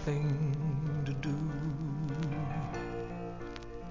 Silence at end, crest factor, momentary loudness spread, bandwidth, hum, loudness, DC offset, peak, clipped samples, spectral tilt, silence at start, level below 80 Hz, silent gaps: 0 s; 12 dB; 10 LU; 7.4 kHz; none; -36 LUFS; 0.1%; -22 dBFS; under 0.1%; -8 dB/octave; 0 s; -50 dBFS; none